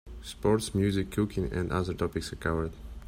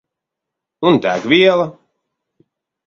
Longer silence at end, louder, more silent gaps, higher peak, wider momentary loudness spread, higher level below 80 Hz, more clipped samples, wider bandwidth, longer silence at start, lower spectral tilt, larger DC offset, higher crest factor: second, 0 s vs 1.15 s; second, -30 LUFS vs -14 LUFS; neither; second, -14 dBFS vs 0 dBFS; about the same, 6 LU vs 8 LU; first, -44 dBFS vs -60 dBFS; neither; first, 16 kHz vs 7.2 kHz; second, 0.05 s vs 0.8 s; about the same, -6 dB/octave vs -6 dB/octave; neither; about the same, 18 dB vs 18 dB